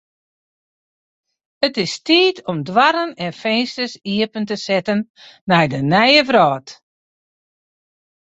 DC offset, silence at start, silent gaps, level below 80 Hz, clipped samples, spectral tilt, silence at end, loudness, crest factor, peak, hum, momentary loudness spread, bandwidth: under 0.1%; 1.6 s; 5.10-5.14 s, 5.41-5.47 s; -60 dBFS; under 0.1%; -5 dB/octave; 1.5 s; -17 LUFS; 18 dB; -2 dBFS; none; 13 LU; 8.2 kHz